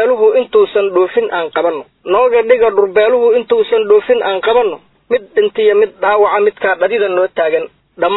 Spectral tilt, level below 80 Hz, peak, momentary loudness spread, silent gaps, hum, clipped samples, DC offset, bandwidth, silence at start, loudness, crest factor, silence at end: -8 dB/octave; -54 dBFS; 0 dBFS; 8 LU; none; none; under 0.1%; under 0.1%; 4.1 kHz; 0 s; -12 LUFS; 12 dB; 0 s